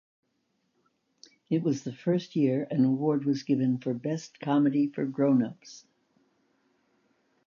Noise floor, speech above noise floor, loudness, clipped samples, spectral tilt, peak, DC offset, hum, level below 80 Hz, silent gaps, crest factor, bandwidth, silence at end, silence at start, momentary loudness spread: -76 dBFS; 49 dB; -28 LUFS; under 0.1%; -7.5 dB/octave; -14 dBFS; under 0.1%; none; -78 dBFS; none; 16 dB; 7.2 kHz; 1.7 s; 1.5 s; 8 LU